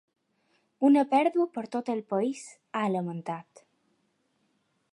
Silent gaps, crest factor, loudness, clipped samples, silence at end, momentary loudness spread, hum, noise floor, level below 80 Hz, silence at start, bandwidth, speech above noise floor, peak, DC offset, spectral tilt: none; 18 dB; -28 LUFS; under 0.1%; 1.5 s; 14 LU; none; -73 dBFS; -84 dBFS; 0.8 s; 11 kHz; 46 dB; -12 dBFS; under 0.1%; -6.5 dB/octave